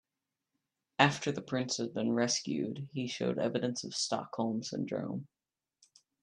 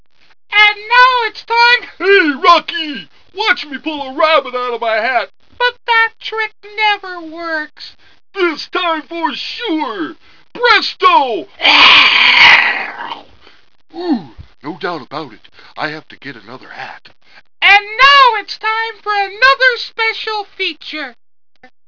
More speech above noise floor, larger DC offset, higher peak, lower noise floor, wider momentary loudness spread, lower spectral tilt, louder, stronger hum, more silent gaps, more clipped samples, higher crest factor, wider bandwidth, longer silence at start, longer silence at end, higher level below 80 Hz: first, over 56 dB vs 28 dB; second, under 0.1% vs 0.9%; second, -6 dBFS vs 0 dBFS; first, under -90 dBFS vs -42 dBFS; second, 10 LU vs 21 LU; first, -4 dB/octave vs -2.5 dB/octave; second, -34 LUFS vs -11 LUFS; neither; neither; second, under 0.1% vs 0.3%; first, 28 dB vs 14 dB; first, 10.5 kHz vs 5.4 kHz; first, 1 s vs 0.5 s; first, 0.95 s vs 0.75 s; second, -78 dBFS vs -52 dBFS